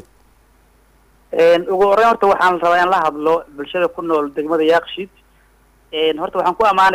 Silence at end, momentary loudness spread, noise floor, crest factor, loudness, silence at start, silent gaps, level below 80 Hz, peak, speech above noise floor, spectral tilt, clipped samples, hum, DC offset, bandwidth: 0 s; 12 LU; -53 dBFS; 12 dB; -16 LUFS; 1.3 s; none; -52 dBFS; -6 dBFS; 38 dB; -4.5 dB/octave; under 0.1%; none; under 0.1%; 15.5 kHz